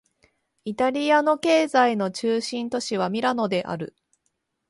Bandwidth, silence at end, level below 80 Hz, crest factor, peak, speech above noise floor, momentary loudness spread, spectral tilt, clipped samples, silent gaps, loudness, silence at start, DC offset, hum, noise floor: 11.5 kHz; 0.8 s; -68 dBFS; 18 dB; -6 dBFS; 53 dB; 13 LU; -4.5 dB/octave; under 0.1%; none; -23 LUFS; 0.65 s; under 0.1%; none; -75 dBFS